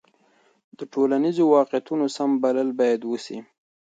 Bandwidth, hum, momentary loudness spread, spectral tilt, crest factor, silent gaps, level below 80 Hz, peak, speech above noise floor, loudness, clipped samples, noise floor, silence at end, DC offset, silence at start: 9 kHz; none; 14 LU; -6 dB/octave; 18 dB; none; -76 dBFS; -6 dBFS; 40 dB; -22 LUFS; under 0.1%; -62 dBFS; 0.5 s; under 0.1%; 0.8 s